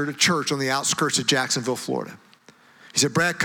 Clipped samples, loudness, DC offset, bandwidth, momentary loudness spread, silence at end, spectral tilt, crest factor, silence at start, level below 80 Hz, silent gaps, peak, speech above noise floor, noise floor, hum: under 0.1%; -22 LUFS; under 0.1%; over 20 kHz; 9 LU; 0 s; -2.5 dB/octave; 18 dB; 0 s; -64 dBFS; none; -6 dBFS; 30 dB; -53 dBFS; none